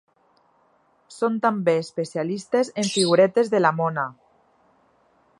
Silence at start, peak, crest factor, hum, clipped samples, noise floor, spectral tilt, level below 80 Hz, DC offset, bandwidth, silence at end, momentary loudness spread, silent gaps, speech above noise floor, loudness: 1.1 s; -4 dBFS; 20 dB; none; under 0.1%; -62 dBFS; -5 dB/octave; -74 dBFS; under 0.1%; 11.5 kHz; 1.3 s; 10 LU; none; 41 dB; -22 LUFS